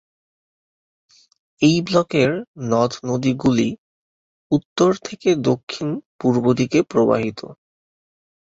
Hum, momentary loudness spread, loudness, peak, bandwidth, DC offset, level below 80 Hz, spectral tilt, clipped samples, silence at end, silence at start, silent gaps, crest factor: none; 9 LU; -20 LUFS; -2 dBFS; 8 kHz; under 0.1%; -54 dBFS; -6 dB/octave; under 0.1%; 0.95 s; 1.6 s; 2.48-2.54 s, 3.78-4.50 s, 4.65-4.76 s, 5.63-5.67 s, 6.06-6.19 s; 18 dB